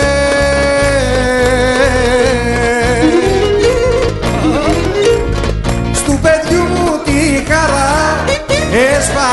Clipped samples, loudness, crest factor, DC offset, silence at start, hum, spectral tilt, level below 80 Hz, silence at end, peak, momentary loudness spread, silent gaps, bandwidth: under 0.1%; -12 LUFS; 12 dB; under 0.1%; 0 s; none; -4.5 dB/octave; -22 dBFS; 0 s; 0 dBFS; 3 LU; none; 12 kHz